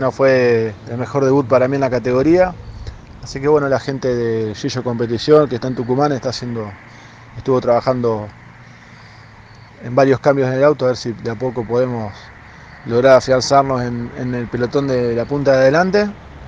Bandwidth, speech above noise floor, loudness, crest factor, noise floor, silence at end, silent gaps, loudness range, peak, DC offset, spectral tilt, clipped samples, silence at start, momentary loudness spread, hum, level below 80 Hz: 8.8 kHz; 25 dB; -16 LUFS; 16 dB; -41 dBFS; 0 s; none; 4 LU; 0 dBFS; under 0.1%; -6.5 dB/octave; under 0.1%; 0 s; 14 LU; none; -44 dBFS